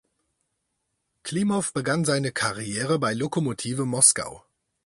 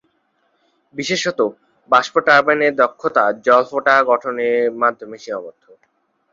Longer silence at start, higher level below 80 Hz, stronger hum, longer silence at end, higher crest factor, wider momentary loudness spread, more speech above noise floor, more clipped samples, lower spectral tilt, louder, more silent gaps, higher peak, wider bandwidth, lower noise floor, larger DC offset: first, 1.25 s vs 0.95 s; about the same, -62 dBFS vs -66 dBFS; neither; second, 0.45 s vs 0.85 s; first, 24 dB vs 18 dB; second, 11 LU vs 15 LU; first, 53 dB vs 48 dB; neither; about the same, -3.5 dB/octave vs -3.5 dB/octave; second, -23 LUFS vs -16 LUFS; neither; about the same, -2 dBFS vs 0 dBFS; first, 11.5 kHz vs 7.6 kHz; first, -78 dBFS vs -65 dBFS; neither